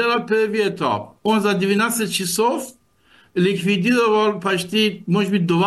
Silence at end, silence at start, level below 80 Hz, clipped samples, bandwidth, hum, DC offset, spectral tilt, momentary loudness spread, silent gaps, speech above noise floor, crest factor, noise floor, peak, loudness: 0 s; 0 s; -62 dBFS; under 0.1%; 12.5 kHz; none; under 0.1%; -4.5 dB/octave; 6 LU; none; 36 dB; 12 dB; -55 dBFS; -6 dBFS; -19 LUFS